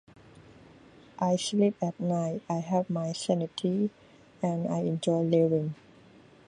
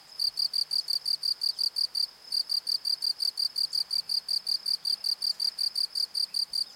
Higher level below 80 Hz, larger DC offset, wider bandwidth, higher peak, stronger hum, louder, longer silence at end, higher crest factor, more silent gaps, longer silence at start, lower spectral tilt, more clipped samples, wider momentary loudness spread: first, -70 dBFS vs -80 dBFS; neither; second, 11 kHz vs 17 kHz; first, -12 dBFS vs -16 dBFS; neither; about the same, -29 LUFS vs -27 LUFS; first, 0.75 s vs 0 s; about the same, 18 dB vs 14 dB; neither; first, 0.35 s vs 0.1 s; first, -6.5 dB/octave vs 3 dB/octave; neither; first, 8 LU vs 2 LU